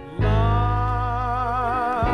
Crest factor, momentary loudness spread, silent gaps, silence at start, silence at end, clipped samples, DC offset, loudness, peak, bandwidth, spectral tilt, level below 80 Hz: 14 dB; 4 LU; none; 0 s; 0 s; under 0.1%; under 0.1%; -22 LUFS; -8 dBFS; 6.4 kHz; -8 dB/octave; -28 dBFS